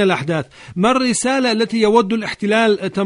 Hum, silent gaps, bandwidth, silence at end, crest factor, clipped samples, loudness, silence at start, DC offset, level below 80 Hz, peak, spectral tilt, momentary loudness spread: none; none; 11 kHz; 0 s; 16 dB; under 0.1%; -16 LUFS; 0 s; under 0.1%; -54 dBFS; 0 dBFS; -4.5 dB/octave; 7 LU